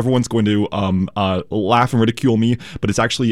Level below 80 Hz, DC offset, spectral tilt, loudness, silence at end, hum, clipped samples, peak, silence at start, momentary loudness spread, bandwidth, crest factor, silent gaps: -46 dBFS; 0.6%; -6 dB/octave; -18 LUFS; 0 s; none; under 0.1%; -2 dBFS; 0 s; 5 LU; 13.5 kHz; 16 dB; none